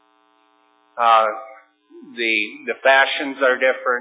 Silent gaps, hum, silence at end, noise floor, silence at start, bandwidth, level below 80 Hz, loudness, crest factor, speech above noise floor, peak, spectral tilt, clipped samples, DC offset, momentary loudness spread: none; none; 0 s; -59 dBFS; 0.95 s; 4 kHz; under -90 dBFS; -18 LUFS; 18 dB; 41 dB; -2 dBFS; -5 dB/octave; under 0.1%; under 0.1%; 14 LU